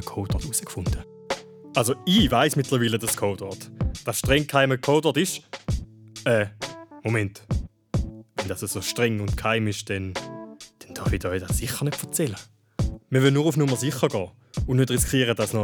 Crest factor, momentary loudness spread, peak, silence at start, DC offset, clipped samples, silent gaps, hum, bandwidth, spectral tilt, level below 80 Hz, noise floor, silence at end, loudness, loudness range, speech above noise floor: 20 dB; 13 LU; -4 dBFS; 0 s; under 0.1%; under 0.1%; none; none; over 20 kHz; -4.5 dB/octave; -38 dBFS; -44 dBFS; 0 s; -25 LUFS; 5 LU; 21 dB